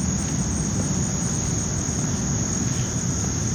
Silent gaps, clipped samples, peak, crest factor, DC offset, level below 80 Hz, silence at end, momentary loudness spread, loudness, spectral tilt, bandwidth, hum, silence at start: none; under 0.1%; -10 dBFS; 14 dB; under 0.1%; -36 dBFS; 0 s; 1 LU; -24 LUFS; -4.5 dB/octave; 18 kHz; none; 0 s